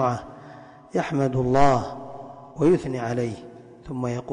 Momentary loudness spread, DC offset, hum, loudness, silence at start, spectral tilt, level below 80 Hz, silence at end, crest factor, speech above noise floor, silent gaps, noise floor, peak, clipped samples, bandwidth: 23 LU; under 0.1%; none; -24 LUFS; 0 s; -7.5 dB/octave; -48 dBFS; 0 s; 18 dB; 23 dB; none; -45 dBFS; -6 dBFS; under 0.1%; 10.5 kHz